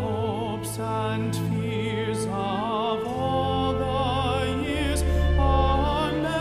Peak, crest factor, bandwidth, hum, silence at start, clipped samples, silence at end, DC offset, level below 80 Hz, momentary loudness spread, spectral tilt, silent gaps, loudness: -8 dBFS; 16 dB; 15 kHz; none; 0 s; under 0.1%; 0 s; under 0.1%; -32 dBFS; 5 LU; -6 dB/octave; none; -25 LUFS